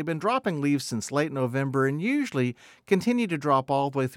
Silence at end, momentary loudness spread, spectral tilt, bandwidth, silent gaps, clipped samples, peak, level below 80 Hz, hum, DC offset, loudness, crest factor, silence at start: 0 s; 4 LU; -6 dB/octave; 16 kHz; none; under 0.1%; -8 dBFS; -70 dBFS; none; under 0.1%; -26 LUFS; 16 dB; 0 s